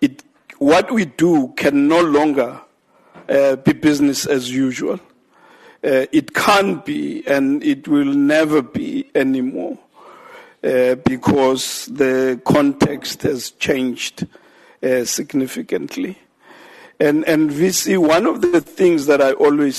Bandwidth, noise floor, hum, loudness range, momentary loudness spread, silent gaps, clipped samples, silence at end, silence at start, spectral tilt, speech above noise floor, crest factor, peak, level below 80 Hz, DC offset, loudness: 13 kHz; -53 dBFS; none; 4 LU; 10 LU; none; under 0.1%; 0 s; 0 s; -4.5 dB/octave; 37 dB; 14 dB; -2 dBFS; -54 dBFS; under 0.1%; -17 LUFS